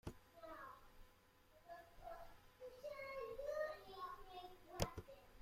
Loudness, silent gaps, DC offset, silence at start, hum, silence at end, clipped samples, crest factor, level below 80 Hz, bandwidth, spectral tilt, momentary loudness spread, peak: -52 LUFS; none; under 0.1%; 0.05 s; none; 0 s; under 0.1%; 32 dB; -64 dBFS; 16 kHz; -4.5 dB/octave; 15 LU; -22 dBFS